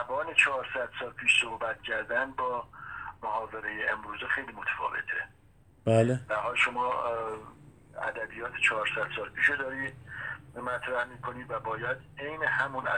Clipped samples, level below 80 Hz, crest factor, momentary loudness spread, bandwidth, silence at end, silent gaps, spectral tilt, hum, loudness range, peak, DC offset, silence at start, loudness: under 0.1%; -62 dBFS; 22 dB; 13 LU; 10.5 kHz; 0 s; none; -4.5 dB/octave; none; 4 LU; -10 dBFS; under 0.1%; 0 s; -30 LUFS